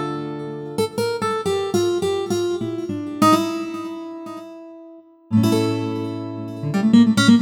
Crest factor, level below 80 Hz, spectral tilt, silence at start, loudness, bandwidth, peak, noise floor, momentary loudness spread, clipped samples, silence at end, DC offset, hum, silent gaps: 18 dB; -58 dBFS; -6 dB/octave; 0 s; -20 LUFS; 17.5 kHz; -2 dBFS; -44 dBFS; 17 LU; under 0.1%; 0 s; under 0.1%; none; none